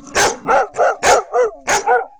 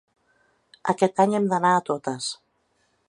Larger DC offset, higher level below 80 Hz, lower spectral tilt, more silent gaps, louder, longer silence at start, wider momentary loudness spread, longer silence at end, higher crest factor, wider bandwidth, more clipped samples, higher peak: first, 0.3% vs under 0.1%; first, -44 dBFS vs -72 dBFS; second, -1.5 dB/octave vs -5 dB/octave; neither; first, -15 LUFS vs -23 LUFS; second, 0.05 s vs 0.85 s; second, 4 LU vs 11 LU; second, 0.1 s vs 0.75 s; second, 14 dB vs 20 dB; first, over 20 kHz vs 11.5 kHz; neither; first, 0 dBFS vs -4 dBFS